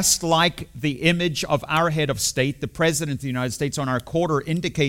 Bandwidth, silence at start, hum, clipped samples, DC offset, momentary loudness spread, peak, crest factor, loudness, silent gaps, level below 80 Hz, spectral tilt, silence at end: 16.5 kHz; 0 s; none; under 0.1%; under 0.1%; 6 LU; -2 dBFS; 20 dB; -22 LUFS; none; -48 dBFS; -4 dB/octave; 0 s